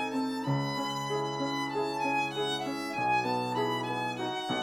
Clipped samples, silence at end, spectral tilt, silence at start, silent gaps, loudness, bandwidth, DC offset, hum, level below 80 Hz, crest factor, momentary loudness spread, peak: under 0.1%; 0 s; -5 dB/octave; 0 s; none; -31 LUFS; 18 kHz; under 0.1%; none; -68 dBFS; 14 dB; 4 LU; -18 dBFS